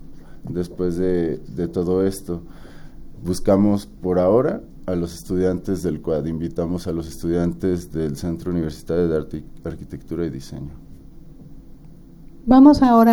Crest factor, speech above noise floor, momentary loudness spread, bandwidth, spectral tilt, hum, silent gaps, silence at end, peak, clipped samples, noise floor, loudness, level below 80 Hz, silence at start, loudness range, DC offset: 20 dB; 22 dB; 16 LU; 17.5 kHz; -7.5 dB/octave; none; none; 0 s; -2 dBFS; under 0.1%; -42 dBFS; -21 LUFS; -38 dBFS; 0 s; 6 LU; under 0.1%